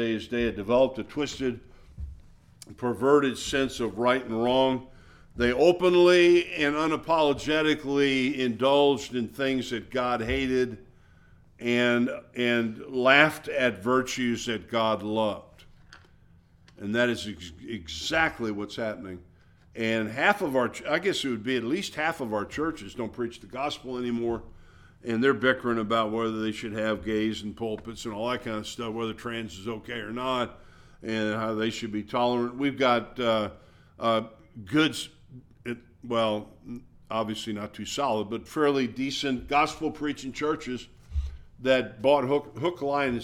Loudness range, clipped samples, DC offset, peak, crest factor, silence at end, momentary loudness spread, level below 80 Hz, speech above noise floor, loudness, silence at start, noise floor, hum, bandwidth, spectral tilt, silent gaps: 8 LU; under 0.1%; under 0.1%; -4 dBFS; 24 dB; 0 s; 13 LU; -50 dBFS; 31 dB; -27 LUFS; 0 s; -57 dBFS; none; 15.5 kHz; -5 dB/octave; none